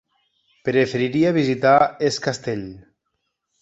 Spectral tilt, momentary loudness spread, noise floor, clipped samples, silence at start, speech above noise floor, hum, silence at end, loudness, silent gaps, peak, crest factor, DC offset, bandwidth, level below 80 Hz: -5.5 dB/octave; 13 LU; -76 dBFS; under 0.1%; 0.65 s; 56 dB; none; 0.8 s; -20 LUFS; none; -2 dBFS; 18 dB; under 0.1%; 8.2 kHz; -58 dBFS